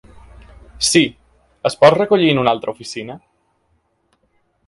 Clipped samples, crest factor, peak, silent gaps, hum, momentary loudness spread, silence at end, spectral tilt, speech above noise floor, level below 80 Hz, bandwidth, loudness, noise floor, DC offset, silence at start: under 0.1%; 18 dB; 0 dBFS; none; none; 16 LU; 1.5 s; -4 dB/octave; 49 dB; -48 dBFS; 11.5 kHz; -15 LUFS; -64 dBFS; under 0.1%; 0.8 s